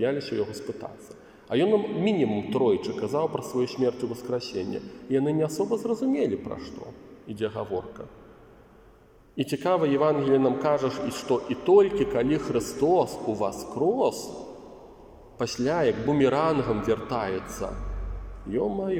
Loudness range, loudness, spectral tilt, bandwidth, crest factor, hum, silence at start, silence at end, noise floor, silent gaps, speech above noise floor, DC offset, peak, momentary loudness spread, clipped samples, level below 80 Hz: 6 LU; -26 LUFS; -6 dB/octave; 16 kHz; 18 dB; none; 0 s; 0 s; -55 dBFS; none; 29 dB; under 0.1%; -8 dBFS; 16 LU; under 0.1%; -48 dBFS